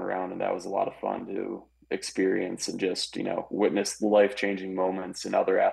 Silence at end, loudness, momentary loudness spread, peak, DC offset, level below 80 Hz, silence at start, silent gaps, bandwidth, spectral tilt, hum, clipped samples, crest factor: 0 s; -28 LUFS; 11 LU; -10 dBFS; under 0.1%; -66 dBFS; 0 s; none; 12.5 kHz; -4 dB/octave; none; under 0.1%; 18 dB